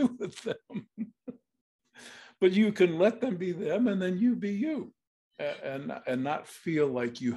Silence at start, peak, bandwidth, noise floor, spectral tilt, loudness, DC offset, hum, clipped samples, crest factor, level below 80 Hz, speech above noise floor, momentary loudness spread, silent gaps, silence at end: 0 s; -10 dBFS; 12 kHz; -51 dBFS; -7 dB/octave; -30 LUFS; under 0.1%; none; under 0.1%; 20 dB; -76 dBFS; 23 dB; 18 LU; 1.61-1.79 s, 5.07-5.31 s; 0 s